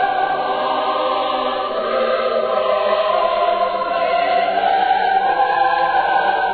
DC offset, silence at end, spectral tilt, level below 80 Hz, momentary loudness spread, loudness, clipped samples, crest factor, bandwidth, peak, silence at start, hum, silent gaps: under 0.1%; 0 s; -6 dB/octave; -54 dBFS; 3 LU; -17 LUFS; under 0.1%; 12 dB; 4.7 kHz; -4 dBFS; 0 s; none; none